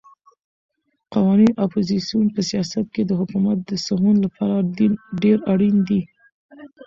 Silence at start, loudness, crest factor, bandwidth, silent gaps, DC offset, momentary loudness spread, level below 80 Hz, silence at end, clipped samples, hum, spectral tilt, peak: 1.1 s; -19 LUFS; 14 dB; 7.6 kHz; 6.32-6.49 s; under 0.1%; 7 LU; -56 dBFS; 0 s; under 0.1%; none; -7 dB/octave; -6 dBFS